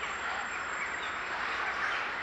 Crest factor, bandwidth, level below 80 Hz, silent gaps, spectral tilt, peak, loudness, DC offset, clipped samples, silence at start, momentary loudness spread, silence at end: 14 dB; 11.5 kHz; -62 dBFS; none; -1.5 dB/octave; -20 dBFS; -33 LUFS; under 0.1%; under 0.1%; 0 s; 3 LU; 0 s